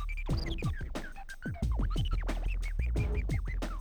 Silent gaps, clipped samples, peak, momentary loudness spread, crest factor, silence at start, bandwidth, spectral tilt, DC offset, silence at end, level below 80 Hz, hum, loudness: none; under 0.1%; -22 dBFS; 8 LU; 10 dB; 0 s; 15.5 kHz; -6.5 dB/octave; under 0.1%; 0 s; -34 dBFS; none; -36 LUFS